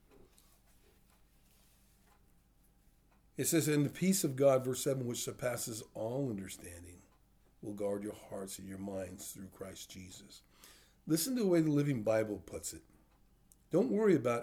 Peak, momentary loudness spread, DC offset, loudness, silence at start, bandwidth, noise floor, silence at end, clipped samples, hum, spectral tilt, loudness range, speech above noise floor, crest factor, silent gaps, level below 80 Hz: -18 dBFS; 20 LU; under 0.1%; -35 LUFS; 3.4 s; over 20 kHz; -68 dBFS; 0 s; under 0.1%; none; -5 dB/octave; 10 LU; 33 dB; 20 dB; none; -68 dBFS